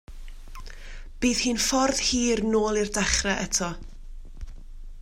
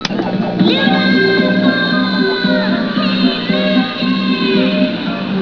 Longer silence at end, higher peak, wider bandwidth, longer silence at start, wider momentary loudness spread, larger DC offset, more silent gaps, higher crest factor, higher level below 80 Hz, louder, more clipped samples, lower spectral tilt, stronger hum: about the same, 0 s vs 0 s; second, -8 dBFS vs 0 dBFS; first, 16 kHz vs 5.4 kHz; about the same, 0.1 s vs 0 s; first, 23 LU vs 5 LU; second, under 0.1% vs 0.4%; neither; first, 20 dB vs 14 dB; first, -38 dBFS vs -52 dBFS; second, -24 LUFS vs -14 LUFS; neither; second, -2.5 dB/octave vs -6.5 dB/octave; neither